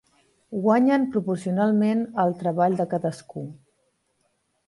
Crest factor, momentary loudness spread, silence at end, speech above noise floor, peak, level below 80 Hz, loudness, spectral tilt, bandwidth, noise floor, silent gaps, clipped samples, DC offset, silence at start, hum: 18 dB; 16 LU; 1.15 s; 48 dB; -8 dBFS; -68 dBFS; -23 LUFS; -8 dB/octave; 11.5 kHz; -71 dBFS; none; under 0.1%; under 0.1%; 0.5 s; none